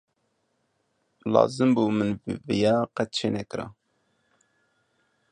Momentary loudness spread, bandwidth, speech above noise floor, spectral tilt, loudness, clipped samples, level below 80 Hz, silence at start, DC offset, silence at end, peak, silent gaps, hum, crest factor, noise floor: 14 LU; 10.5 kHz; 49 dB; -6 dB/octave; -25 LUFS; under 0.1%; -60 dBFS; 1.25 s; under 0.1%; 1.6 s; -4 dBFS; none; none; 24 dB; -73 dBFS